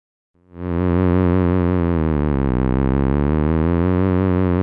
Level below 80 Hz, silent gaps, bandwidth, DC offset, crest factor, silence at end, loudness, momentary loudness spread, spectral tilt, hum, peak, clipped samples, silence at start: -28 dBFS; none; 4.4 kHz; under 0.1%; 12 dB; 0 s; -18 LUFS; 3 LU; -12.5 dB/octave; none; -6 dBFS; under 0.1%; 0.55 s